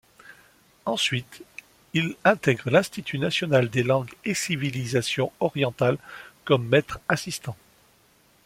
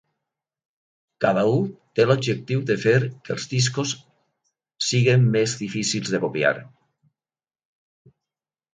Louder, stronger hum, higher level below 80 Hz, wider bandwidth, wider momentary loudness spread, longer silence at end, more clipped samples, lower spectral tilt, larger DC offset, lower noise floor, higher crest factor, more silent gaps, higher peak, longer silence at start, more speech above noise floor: second, -25 LUFS vs -22 LUFS; neither; about the same, -60 dBFS vs -62 dBFS; first, 16.5 kHz vs 9.4 kHz; first, 17 LU vs 9 LU; second, 0.9 s vs 2.1 s; neither; about the same, -5 dB/octave vs -5 dB/octave; neither; second, -60 dBFS vs under -90 dBFS; about the same, 22 dB vs 20 dB; neither; about the same, -4 dBFS vs -4 dBFS; second, 0.25 s vs 1.2 s; second, 36 dB vs over 69 dB